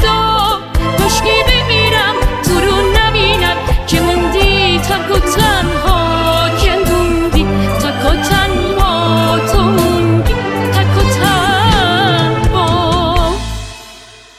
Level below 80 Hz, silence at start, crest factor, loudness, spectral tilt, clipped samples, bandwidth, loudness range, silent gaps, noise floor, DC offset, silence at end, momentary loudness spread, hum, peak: -18 dBFS; 0 s; 12 dB; -12 LUFS; -4.5 dB/octave; under 0.1%; 19 kHz; 1 LU; none; -36 dBFS; under 0.1%; 0.2 s; 4 LU; none; 0 dBFS